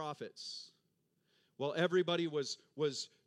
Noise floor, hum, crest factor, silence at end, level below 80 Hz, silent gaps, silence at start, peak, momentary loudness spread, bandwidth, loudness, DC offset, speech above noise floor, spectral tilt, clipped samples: -80 dBFS; none; 20 dB; 0.2 s; under -90 dBFS; none; 0 s; -18 dBFS; 13 LU; 11 kHz; -37 LUFS; under 0.1%; 42 dB; -4.5 dB/octave; under 0.1%